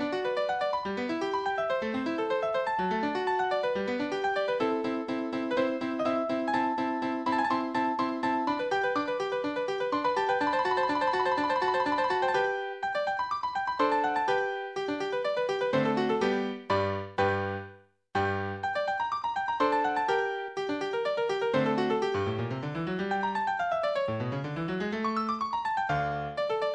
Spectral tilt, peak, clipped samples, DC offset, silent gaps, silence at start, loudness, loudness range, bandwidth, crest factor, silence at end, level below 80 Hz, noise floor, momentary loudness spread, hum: -6 dB/octave; -14 dBFS; under 0.1%; under 0.1%; none; 0 s; -29 LUFS; 2 LU; 9.8 kHz; 16 dB; 0 s; -64 dBFS; -52 dBFS; 5 LU; none